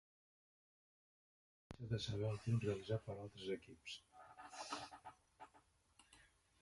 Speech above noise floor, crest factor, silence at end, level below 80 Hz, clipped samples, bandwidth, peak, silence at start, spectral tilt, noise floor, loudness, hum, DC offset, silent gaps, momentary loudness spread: 30 dB; 20 dB; 0.4 s; -70 dBFS; under 0.1%; 11.5 kHz; -28 dBFS; 1.7 s; -6 dB/octave; -74 dBFS; -46 LUFS; none; under 0.1%; none; 22 LU